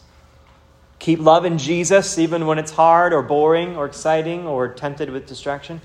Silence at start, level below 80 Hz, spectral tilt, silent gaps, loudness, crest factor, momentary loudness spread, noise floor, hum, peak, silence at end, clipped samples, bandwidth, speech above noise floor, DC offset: 1 s; -54 dBFS; -5 dB/octave; none; -18 LUFS; 18 dB; 13 LU; -50 dBFS; none; 0 dBFS; 0.05 s; under 0.1%; 12.5 kHz; 33 dB; under 0.1%